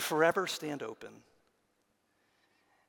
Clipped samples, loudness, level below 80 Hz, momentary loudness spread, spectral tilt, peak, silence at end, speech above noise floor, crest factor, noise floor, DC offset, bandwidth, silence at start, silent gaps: under 0.1%; -32 LUFS; -86 dBFS; 22 LU; -3.5 dB/octave; -14 dBFS; 1.7 s; 43 dB; 24 dB; -76 dBFS; under 0.1%; 18 kHz; 0 s; none